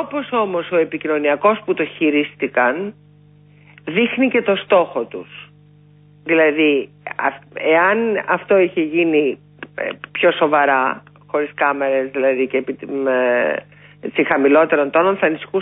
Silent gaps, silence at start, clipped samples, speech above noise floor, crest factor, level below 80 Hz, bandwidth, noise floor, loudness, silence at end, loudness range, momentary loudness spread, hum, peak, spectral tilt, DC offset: none; 0 s; under 0.1%; 31 dB; 16 dB; -64 dBFS; 3.9 kHz; -48 dBFS; -17 LUFS; 0 s; 3 LU; 12 LU; 50 Hz at -50 dBFS; -2 dBFS; -10 dB/octave; under 0.1%